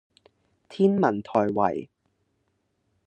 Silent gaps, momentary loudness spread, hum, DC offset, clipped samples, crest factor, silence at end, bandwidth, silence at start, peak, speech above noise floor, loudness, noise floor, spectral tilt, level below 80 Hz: none; 12 LU; none; under 0.1%; under 0.1%; 22 dB; 1.2 s; 8.6 kHz; 0.7 s; -6 dBFS; 50 dB; -24 LUFS; -73 dBFS; -8.5 dB/octave; -70 dBFS